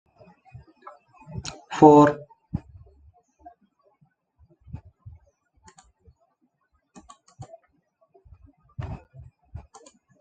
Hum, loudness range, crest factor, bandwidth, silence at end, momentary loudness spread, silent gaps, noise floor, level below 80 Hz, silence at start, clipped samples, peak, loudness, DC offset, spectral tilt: none; 23 LU; 26 dB; 8.6 kHz; 1.25 s; 32 LU; none; -71 dBFS; -54 dBFS; 1.35 s; under 0.1%; -2 dBFS; -19 LUFS; under 0.1%; -7 dB/octave